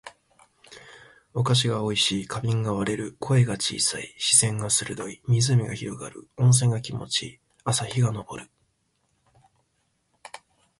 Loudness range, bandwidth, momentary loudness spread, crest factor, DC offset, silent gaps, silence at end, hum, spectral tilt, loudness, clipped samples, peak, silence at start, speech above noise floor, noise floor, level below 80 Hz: 8 LU; 11.5 kHz; 17 LU; 22 dB; under 0.1%; none; 0.4 s; none; -4 dB/octave; -24 LUFS; under 0.1%; -4 dBFS; 0.05 s; 48 dB; -72 dBFS; -58 dBFS